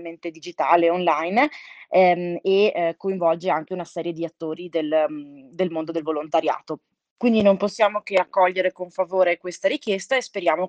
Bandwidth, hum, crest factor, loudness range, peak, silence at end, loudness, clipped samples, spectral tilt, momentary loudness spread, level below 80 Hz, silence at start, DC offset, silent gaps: 9.2 kHz; none; 18 dB; 5 LU; -4 dBFS; 0 s; -22 LUFS; under 0.1%; -5.5 dB/octave; 11 LU; -70 dBFS; 0 s; under 0.1%; 7.11-7.16 s